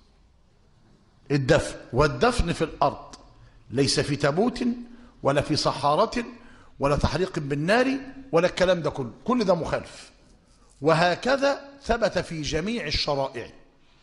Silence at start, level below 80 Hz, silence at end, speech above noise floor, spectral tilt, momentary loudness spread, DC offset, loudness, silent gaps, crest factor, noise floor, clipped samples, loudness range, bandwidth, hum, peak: 1.3 s; -42 dBFS; 0.5 s; 34 dB; -5 dB/octave; 11 LU; under 0.1%; -25 LUFS; none; 20 dB; -58 dBFS; under 0.1%; 2 LU; 11.5 kHz; none; -6 dBFS